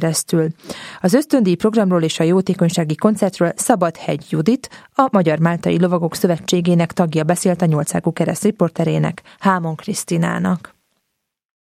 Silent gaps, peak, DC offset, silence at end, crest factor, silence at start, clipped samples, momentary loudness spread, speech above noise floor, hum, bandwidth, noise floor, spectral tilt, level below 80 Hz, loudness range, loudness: none; 0 dBFS; under 0.1%; 1.2 s; 16 dB; 0 s; under 0.1%; 7 LU; 59 dB; none; 15 kHz; -75 dBFS; -6 dB/octave; -58 dBFS; 3 LU; -17 LUFS